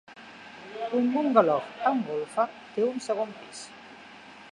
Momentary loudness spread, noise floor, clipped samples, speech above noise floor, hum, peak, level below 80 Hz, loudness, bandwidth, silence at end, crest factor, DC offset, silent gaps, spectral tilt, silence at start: 24 LU; -48 dBFS; under 0.1%; 21 dB; none; -6 dBFS; -76 dBFS; -27 LUFS; 11.5 kHz; 0 s; 24 dB; under 0.1%; none; -5.5 dB/octave; 0.1 s